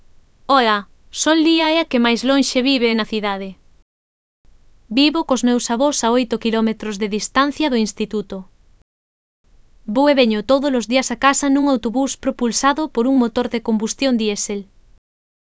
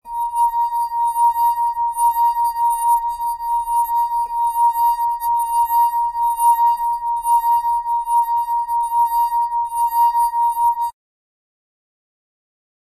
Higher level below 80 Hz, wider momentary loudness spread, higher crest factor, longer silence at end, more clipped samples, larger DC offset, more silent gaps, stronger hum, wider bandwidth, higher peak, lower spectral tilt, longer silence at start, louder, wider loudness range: about the same, -50 dBFS vs -52 dBFS; first, 9 LU vs 4 LU; first, 18 dB vs 12 dB; second, 0.95 s vs 2 s; neither; neither; first, 3.82-4.44 s, 8.82-9.44 s vs none; neither; second, 8 kHz vs 14 kHz; first, 0 dBFS vs -6 dBFS; first, -3.5 dB/octave vs 1 dB/octave; first, 0.5 s vs 0.05 s; about the same, -17 LUFS vs -18 LUFS; about the same, 4 LU vs 2 LU